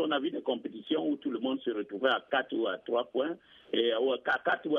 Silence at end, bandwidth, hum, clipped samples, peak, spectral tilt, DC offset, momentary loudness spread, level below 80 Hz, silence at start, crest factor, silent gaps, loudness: 0 s; 6.2 kHz; none; under 0.1%; -14 dBFS; -6 dB/octave; under 0.1%; 6 LU; -80 dBFS; 0 s; 18 dB; none; -31 LUFS